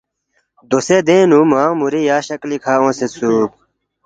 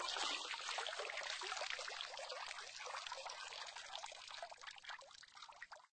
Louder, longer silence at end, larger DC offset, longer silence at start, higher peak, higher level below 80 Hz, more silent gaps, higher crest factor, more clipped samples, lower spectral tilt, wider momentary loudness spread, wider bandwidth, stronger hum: first, -14 LUFS vs -46 LUFS; first, 0.6 s vs 0.1 s; neither; first, 0.7 s vs 0 s; first, 0 dBFS vs -28 dBFS; first, -60 dBFS vs -82 dBFS; neither; second, 14 dB vs 22 dB; neither; first, -5.5 dB/octave vs 1.5 dB/octave; second, 9 LU vs 12 LU; about the same, 9.2 kHz vs 9 kHz; neither